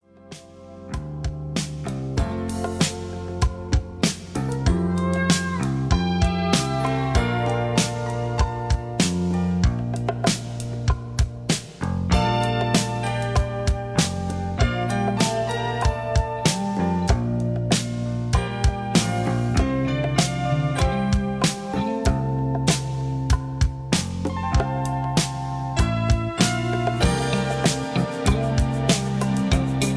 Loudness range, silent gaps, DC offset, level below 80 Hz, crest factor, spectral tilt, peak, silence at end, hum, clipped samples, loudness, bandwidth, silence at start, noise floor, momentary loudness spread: 2 LU; none; under 0.1%; -30 dBFS; 20 dB; -5 dB/octave; -2 dBFS; 0 s; none; under 0.1%; -23 LUFS; 11 kHz; 0.25 s; -44 dBFS; 6 LU